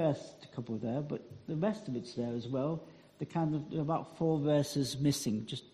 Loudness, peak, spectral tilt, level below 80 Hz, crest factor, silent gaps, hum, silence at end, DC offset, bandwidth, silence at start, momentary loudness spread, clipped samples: -35 LUFS; -18 dBFS; -6.5 dB/octave; -68 dBFS; 16 dB; none; none; 0.05 s; under 0.1%; 14 kHz; 0 s; 11 LU; under 0.1%